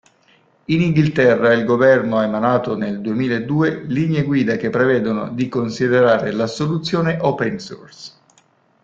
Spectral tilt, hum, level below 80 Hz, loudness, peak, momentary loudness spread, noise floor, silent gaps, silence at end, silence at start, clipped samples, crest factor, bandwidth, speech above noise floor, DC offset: -7 dB/octave; none; -54 dBFS; -17 LUFS; -2 dBFS; 9 LU; -57 dBFS; none; 0.75 s; 0.7 s; under 0.1%; 16 dB; 7.8 kHz; 40 dB; under 0.1%